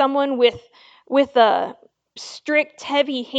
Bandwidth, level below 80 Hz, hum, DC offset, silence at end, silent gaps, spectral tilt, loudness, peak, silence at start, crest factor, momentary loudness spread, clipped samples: 8.2 kHz; -64 dBFS; none; under 0.1%; 0 s; none; -3.5 dB/octave; -19 LUFS; -2 dBFS; 0 s; 18 dB; 15 LU; under 0.1%